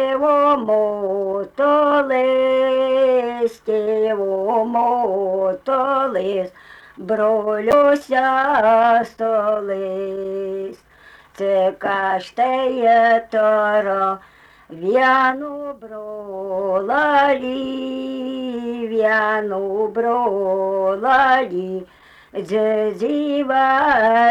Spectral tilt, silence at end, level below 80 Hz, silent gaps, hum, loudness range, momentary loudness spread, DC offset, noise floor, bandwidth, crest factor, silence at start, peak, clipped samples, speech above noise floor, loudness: -6 dB/octave; 0 s; -58 dBFS; none; none; 4 LU; 11 LU; under 0.1%; -47 dBFS; 12 kHz; 12 dB; 0 s; -6 dBFS; under 0.1%; 29 dB; -18 LUFS